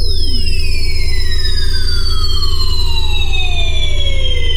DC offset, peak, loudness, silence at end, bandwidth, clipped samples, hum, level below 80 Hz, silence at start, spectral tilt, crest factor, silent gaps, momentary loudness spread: under 0.1%; -2 dBFS; -17 LUFS; 0 s; 11 kHz; under 0.1%; none; -12 dBFS; 0 s; -3.5 dB/octave; 8 dB; none; 2 LU